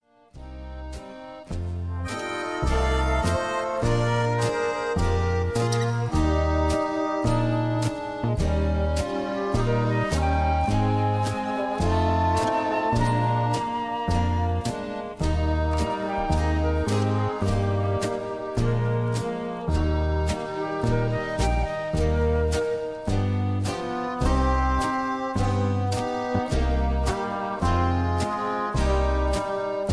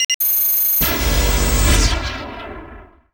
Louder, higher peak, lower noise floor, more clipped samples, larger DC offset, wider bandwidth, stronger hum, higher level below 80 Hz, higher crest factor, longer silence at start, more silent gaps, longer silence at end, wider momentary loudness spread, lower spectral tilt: second, -25 LUFS vs -15 LUFS; second, -8 dBFS vs -2 dBFS; first, -44 dBFS vs -40 dBFS; neither; first, 0.1% vs under 0.1%; second, 11 kHz vs over 20 kHz; neither; second, -30 dBFS vs -22 dBFS; about the same, 16 dB vs 16 dB; first, 0.35 s vs 0 s; second, none vs 0.05-0.20 s; second, 0 s vs 0.3 s; second, 6 LU vs 18 LU; first, -6.5 dB/octave vs -3 dB/octave